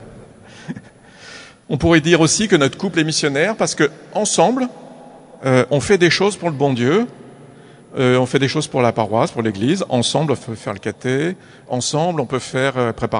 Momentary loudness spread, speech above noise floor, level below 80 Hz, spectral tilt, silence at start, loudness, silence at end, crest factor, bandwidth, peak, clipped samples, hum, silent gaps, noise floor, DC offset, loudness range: 13 LU; 25 dB; -48 dBFS; -4.5 dB/octave; 0 s; -17 LUFS; 0 s; 18 dB; 11 kHz; 0 dBFS; under 0.1%; none; none; -42 dBFS; under 0.1%; 4 LU